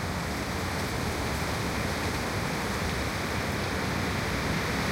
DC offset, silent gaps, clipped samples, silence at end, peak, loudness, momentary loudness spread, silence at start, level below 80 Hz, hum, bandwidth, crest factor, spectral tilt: under 0.1%; none; under 0.1%; 0 s; -18 dBFS; -30 LUFS; 2 LU; 0 s; -40 dBFS; none; 16 kHz; 12 dB; -4.5 dB/octave